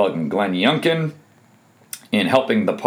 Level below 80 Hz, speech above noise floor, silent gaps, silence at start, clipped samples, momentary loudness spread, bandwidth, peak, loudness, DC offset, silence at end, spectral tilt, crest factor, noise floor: -72 dBFS; 35 dB; none; 0 s; under 0.1%; 12 LU; 16.5 kHz; -2 dBFS; -19 LUFS; under 0.1%; 0 s; -5.5 dB/octave; 18 dB; -53 dBFS